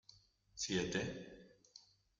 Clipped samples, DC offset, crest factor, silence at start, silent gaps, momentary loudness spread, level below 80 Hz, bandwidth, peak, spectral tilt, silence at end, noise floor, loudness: under 0.1%; under 0.1%; 22 dB; 0.1 s; none; 23 LU; -68 dBFS; 9.6 kHz; -24 dBFS; -3.5 dB/octave; 0.4 s; -68 dBFS; -41 LUFS